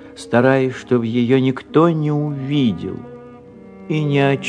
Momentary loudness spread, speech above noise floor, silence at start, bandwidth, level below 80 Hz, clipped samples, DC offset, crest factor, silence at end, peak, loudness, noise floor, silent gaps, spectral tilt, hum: 10 LU; 23 dB; 0 s; 10 kHz; -56 dBFS; under 0.1%; under 0.1%; 18 dB; 0 s; 0 dBFS; -17 LUFS; -40 dBFS; none; -7.5 dB/octave; none